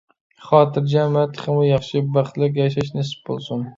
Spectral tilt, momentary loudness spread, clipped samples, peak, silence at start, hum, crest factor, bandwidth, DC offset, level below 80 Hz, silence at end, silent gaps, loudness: -8 dB/octave; 10 LU; under 0.1%; 0 dBFS; 0.4 s; none; 18 dB; 7.6 kHz; under 0.1%; -54 dBFS; 0.05 s; none; -20 LUFS